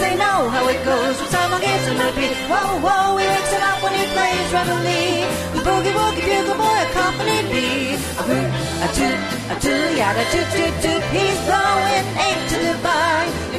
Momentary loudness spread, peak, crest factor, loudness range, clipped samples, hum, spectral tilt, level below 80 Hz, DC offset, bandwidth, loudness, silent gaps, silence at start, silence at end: 4 LU; -4 dBFS; 14 dB; 1 LU; under 0.1%; none; -4 dB/octave; -38 dBFS; under 0.1%; 14 kHz; -18 LUFS; none; 0 s; 0 s